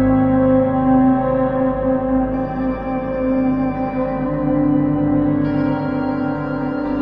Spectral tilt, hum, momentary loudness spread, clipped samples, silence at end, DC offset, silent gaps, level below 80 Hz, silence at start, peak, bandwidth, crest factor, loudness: -11 dB/octave; none; 7 LU; under 0.1%; 0 s; under 0.1%; none; -36 dBFS; 0 s; -4 dBFS; 4.9 kHz; 12 dB; -18 LUFS